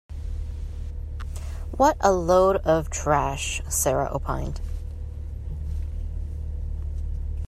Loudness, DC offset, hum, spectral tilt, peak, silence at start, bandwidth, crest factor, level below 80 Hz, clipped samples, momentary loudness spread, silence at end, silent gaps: -26 LUFS; under 0.1%; none; -5 dB/octave; -4 dBFS; 0.1 s; 14 kHz; 20 dB; -32 dBFS; under 0.1%; 16 LU; 0 s; none